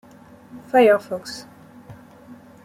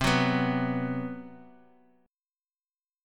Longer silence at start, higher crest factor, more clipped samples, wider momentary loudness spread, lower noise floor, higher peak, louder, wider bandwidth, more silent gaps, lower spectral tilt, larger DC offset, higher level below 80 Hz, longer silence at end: first, 0.55 s vs 0 s; about the same, 18 dB vs 22 dB; neither; about the same, 20 LU vs 18 LU; second, -47 dBFS vs under -90 dBFS; first, -4 dBFS vs -10 dBFS; first, -19 LUFS vs -28 LUFS; about the same, 15.5 kHz vs 17 kHz; neither; about the same, -5 dB/octave vs -5.5 dB/octave; neither; second, -64 dBFS vs -52 dBFS; second, 0.75 s vs 1.6 s